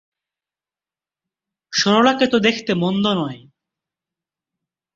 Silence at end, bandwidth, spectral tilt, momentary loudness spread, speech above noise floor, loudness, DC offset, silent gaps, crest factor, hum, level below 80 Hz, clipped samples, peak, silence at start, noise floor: 1.6 s; 7.8 kHz; -4.5 dB/octave; 9 LU; over 73 dB; -17 LUFS; under 0.1%; none; 20 dB; none; -62 dBFS; under 0.1%; -2 dBFS; 1.7 s; under -90 dBFS